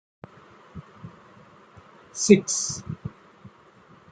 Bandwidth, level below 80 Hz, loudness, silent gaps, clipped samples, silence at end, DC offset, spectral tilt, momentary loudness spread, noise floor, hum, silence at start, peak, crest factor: 9.6 kHz; -62 dBFS; -22 LUFS; none; under 0.1%; 1 s; under 0.1%; -4.5 dB/octave; 27 LU; -53 dBFS; none; 0.75 s; -2 dBFS; 26 dB